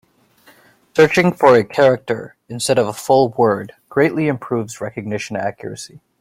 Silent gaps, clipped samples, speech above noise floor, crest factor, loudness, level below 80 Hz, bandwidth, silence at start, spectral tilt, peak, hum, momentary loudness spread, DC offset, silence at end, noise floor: none; under 0.1%; 35 dB; 16 dB; -17 LUFS; -56 dBFS; 16 kHz; 0.95 s; -5.5 dB/octave; -2 dBFS; none; 14 LU; under 0.1%; 0.35 s; -52 dBFS